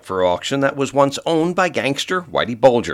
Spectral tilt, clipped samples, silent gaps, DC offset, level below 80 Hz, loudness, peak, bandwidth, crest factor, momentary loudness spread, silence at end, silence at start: -4.5 dB/octave; under 0.1%; none; under 0.1%; -54 dBFS; -18 LUFS; 0 dBFS; 14 kHz; 18 dB; 5 LU; 0 s; 0.05 s